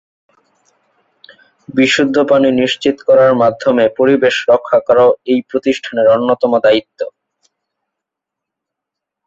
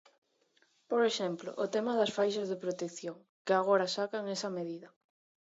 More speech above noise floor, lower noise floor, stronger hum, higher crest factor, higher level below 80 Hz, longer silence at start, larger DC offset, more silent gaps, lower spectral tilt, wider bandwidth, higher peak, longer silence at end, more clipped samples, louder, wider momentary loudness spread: first, 70 dB vs 39 dB; first, -81 dBFS vs -72 dBFS; neither; second, 14 dB vs 20 dB; first, -56 dBFS vs -86 dBFS; first, 1.75 s vs 0.9 s; neither; second, none vs 3.29-3.45 s; about the same, -5 dB/octave vs -4 dB/octave; about the same, 7.8 kHz vs 8 kHz; first, 0 dBFS vs -14 dBFS; first, 2.2 s vs 0.6 s; neither; first, -12 LUFS vs -33 LUFS; second, 7 LU vs 13 LU